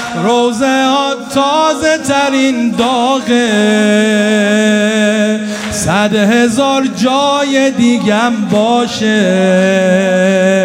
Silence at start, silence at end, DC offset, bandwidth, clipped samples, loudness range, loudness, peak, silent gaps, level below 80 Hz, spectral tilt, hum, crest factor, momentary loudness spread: 0 s; 0 s; under 0.1%; 15.5 kHz; under 0.1%; 1 LU; -11 LUFS; 0 dBFS; none; -48 dBFS; -4.5 dB/octave; none; 10 dB; 3 LU